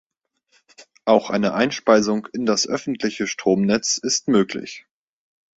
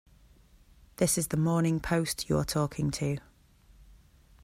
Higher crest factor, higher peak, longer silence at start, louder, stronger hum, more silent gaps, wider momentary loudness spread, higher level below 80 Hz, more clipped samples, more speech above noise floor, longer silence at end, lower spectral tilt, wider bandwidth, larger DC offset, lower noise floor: about the same, 20 dB vs 18 dB; first, -2 dBFS vs -14 dBFS; second, 0.8 s vs 1 s; first, -20 LUFS vs -29 LUFS; neither; neither; first, 9 LU vs 5 LU; second, -60 dBFS vs -52 dBFS; neither; first, 48 dB vs 31 dB; first, 0.8 s vs 0.6 s; about the same, -4 dB/octave vs -5 dB/octave; second, 8 kHz vs 16 kHz; neither; first, -68 dBFS vs -60 dBFS